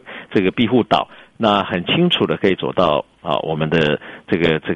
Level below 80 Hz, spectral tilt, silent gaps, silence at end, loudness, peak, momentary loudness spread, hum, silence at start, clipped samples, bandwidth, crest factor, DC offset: -48 dBFS; -7 dB/octave; none; 0 s; -18 LUFS; -2 dBFS; 6 LU; none; 0.05 s; under 0.1%; 9.8 kHz; 16 dB; under 0.1%